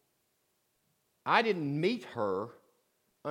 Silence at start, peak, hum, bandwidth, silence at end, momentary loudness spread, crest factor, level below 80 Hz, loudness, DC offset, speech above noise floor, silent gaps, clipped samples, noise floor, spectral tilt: 1.25 s; -10 dBFS; none; 16 kHz; 0 s; 15 LU; 24 dB; -88 dBFS; -32 LUFS; under 0.1%; 46 dB; none; under 0.1%; -77 dBFS; -6.5 dB/octave